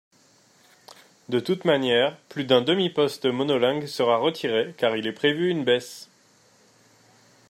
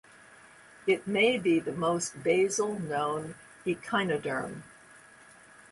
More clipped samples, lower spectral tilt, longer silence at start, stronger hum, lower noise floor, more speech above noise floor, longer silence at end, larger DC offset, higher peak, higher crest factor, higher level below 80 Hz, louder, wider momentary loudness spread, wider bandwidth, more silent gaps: neither; about the same, -5 dB/octave vs -4 dB/octave; first, 1.3 s vs 0.3 s; neither; first, -59 dBFS vs -55 dBFS; first, 36 dB vs 26 dB; first, 1.45 s vs 0.75 s; neither; first, -6 dBFS vs -12 dBFS; about the same, 20 dB vs 18 dB; about the same, -72 dBFS vs -68 dBFS; first, -23 LUFS vs -29 LUFS; second, 6 LU vs 12 LU; first, 16 kHz vs 11.5 kHz; neither